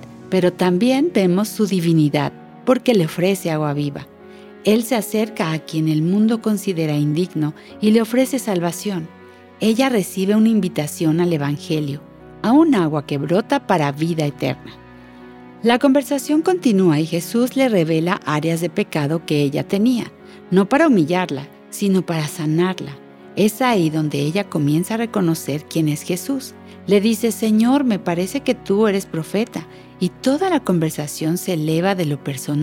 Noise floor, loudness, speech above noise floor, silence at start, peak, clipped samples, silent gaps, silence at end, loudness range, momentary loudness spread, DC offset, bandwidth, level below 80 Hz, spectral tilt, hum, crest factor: -40 dBFS; -19 LUFS; 23 dB; 0 s; -2 dBFS; under 0.1%; none; 0 s; 2 LU; 9 LU; under 0.1%; 17.5 kHz; -60 dBFS; -6 dB/octave; none; 18 dB